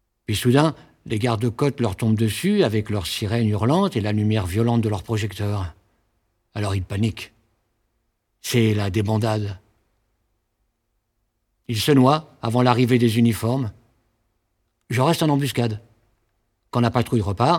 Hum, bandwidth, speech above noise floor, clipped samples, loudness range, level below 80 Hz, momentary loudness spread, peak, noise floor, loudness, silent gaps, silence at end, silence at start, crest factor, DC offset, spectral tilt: none; 17.5 kHz; 53 dB; under 0.1%; 6 LU; -50 dBFS; 11 LU; -2 dBFS; -73 dBFS; -21 LUFS; none; 0 s; 0.3 s; 20 dB; under 0.1%; -6.5 dB/octave